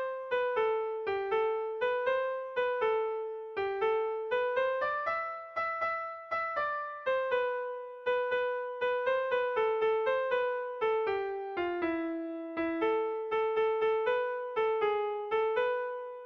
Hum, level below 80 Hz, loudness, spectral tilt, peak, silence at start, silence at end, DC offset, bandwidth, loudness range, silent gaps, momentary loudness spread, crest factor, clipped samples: none; -70 dBFS; -32 LUFS; -5.5 dB/octave; -20 dBFS; 0 s; 0 s; under 0.1%; 6 kHz; 2 LU; none; 6 LU; 12 dB; under 0.1%